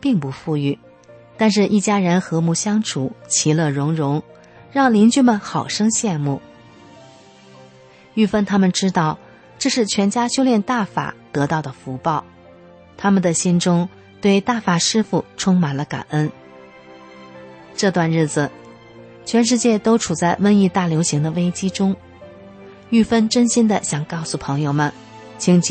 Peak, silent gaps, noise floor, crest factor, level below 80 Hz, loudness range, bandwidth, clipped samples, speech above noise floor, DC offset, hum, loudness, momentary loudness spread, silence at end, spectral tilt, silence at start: -4 dBFS; none; -46 dBFS; 14 dB; -56 dBFS; 4 LU; 8.8 kHz; under 0.1%; 29 dB; under 0.1%; none; -18 LUFS; 9 LU; 0 s; -5 dB/octave; 0 s